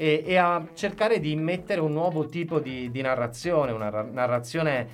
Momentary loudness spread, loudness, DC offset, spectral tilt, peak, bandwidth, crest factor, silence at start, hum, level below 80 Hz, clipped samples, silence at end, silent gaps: 7 LU; -26 LUFS; under 0.1%; -6 dB/octave; -8 dBFS; 15 kHz; 18 dB; 0 s; none; -58 dBFS; under 0.1%; 0 s; none